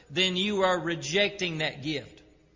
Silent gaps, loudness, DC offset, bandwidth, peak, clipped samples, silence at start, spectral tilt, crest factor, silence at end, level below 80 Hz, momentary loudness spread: none; -27 LUFS; under 0.1%; 7.6 kHz; -12 dBFS; under 0.1%; 0.1 s; -4 dB/octave; 16 dB; 0.4 s; -60 dBFS; 9 LU